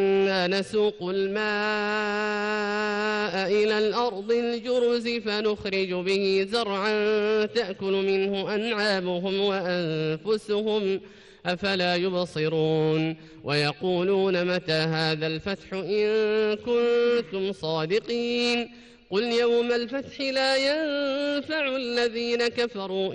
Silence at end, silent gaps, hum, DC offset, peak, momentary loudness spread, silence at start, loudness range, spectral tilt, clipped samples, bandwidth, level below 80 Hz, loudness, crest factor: 0 s; none; none; under 0.1%; -12 dBFS; 5 LU; 0 s; 1 LU; -5.5 dB/octave; under 0.1%; 11 kHz; -62 dBFS; -25 LUFS; 12 dB